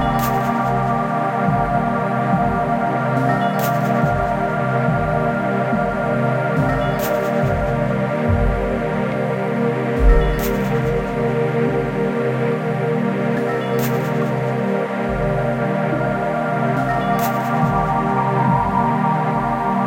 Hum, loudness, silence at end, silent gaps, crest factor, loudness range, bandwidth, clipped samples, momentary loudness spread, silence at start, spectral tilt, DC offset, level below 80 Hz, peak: none; -19 LUFS; 0 s; none; 16 dB; 2 LU; 16.5 kHz; under 0.1%; 3 LU; 0 s; -7.5 dB/octave; under 0.1%; -30 dBFS; -2 dBFS